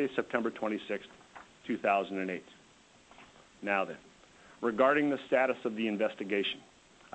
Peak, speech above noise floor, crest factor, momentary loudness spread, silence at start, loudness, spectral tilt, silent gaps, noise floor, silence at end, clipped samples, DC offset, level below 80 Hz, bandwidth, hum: -14 dBFS; 29 dB; 20 dB; 16 LU; 0 s; -32 LUFS; -5.5 dB/octave; none; -61 dBFS; 0.55 s; under 0.1%; under 0.1%; -74 dBFS; 8.6 kHz; none